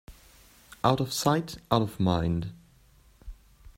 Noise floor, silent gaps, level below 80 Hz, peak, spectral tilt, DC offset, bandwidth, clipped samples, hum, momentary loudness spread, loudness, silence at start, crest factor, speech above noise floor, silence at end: -59 dBFS; none; -50 dBFS; -6 dBFS; -5.5 dB/octave; under 0.1%; 16 kHz; under 0.1%; none; 5 LU; -27 LUFS; 0.1 s; 22 dB; 32 dB; 0.05 s